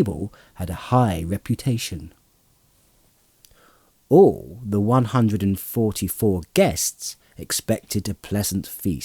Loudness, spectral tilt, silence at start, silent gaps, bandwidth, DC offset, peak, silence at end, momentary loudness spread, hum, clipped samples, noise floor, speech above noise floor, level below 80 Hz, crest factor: -22 LUFS; -5.5 dB/octave; 0 s; none; over 20 kHz; under 0.1%; -2 dBFS; 0 s; 15 LU; none; under 0.1%; -60 dBFS; 39 dB; -48 dBFS; 20 dB